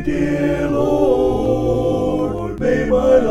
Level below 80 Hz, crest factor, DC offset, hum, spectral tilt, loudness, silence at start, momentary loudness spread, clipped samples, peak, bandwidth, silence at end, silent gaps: -32 dBFS; 16 dB; under 0.1%; none; -7.5 dB/octave; -17 LUFS; 0 s; 5 LU; under 0.1%; -2 dBFS; 13.5 kHz; 0 s; none